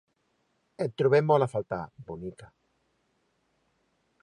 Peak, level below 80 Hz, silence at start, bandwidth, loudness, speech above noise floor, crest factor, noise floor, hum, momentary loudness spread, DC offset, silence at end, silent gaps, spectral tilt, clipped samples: -10 dBFS; -64 dBFS; 0.8 s; 10.5 kHz; -27 LUFS; 47 dB; 22 dB; -74 dBFS; none; 18 LU; under 0.1%; 1.8 s; none; -7.5 dB/octave; under 0.1%